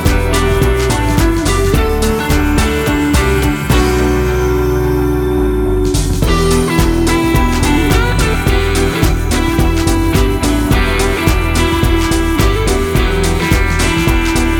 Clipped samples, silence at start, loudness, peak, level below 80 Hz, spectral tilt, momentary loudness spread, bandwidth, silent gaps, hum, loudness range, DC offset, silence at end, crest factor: under 0.1%; 0 s; -13 LUFS; 0 dBFS; -16 dBFS; -5.5 dB/octave; 2 LU; 19.5 kHz; none; none; 1 LU; under 0.1%; 0 s; 12 dB